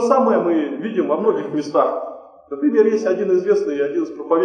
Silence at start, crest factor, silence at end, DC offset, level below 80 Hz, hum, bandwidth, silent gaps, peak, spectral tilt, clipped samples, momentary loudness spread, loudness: 0 s; 16 dB; 0 s; under 0.1%; -68 dBFS; none; 9.2 kHz; none; -2 dBFS; -6.5 dB/octave; under 0.1%; 8 LU; -19 LUFS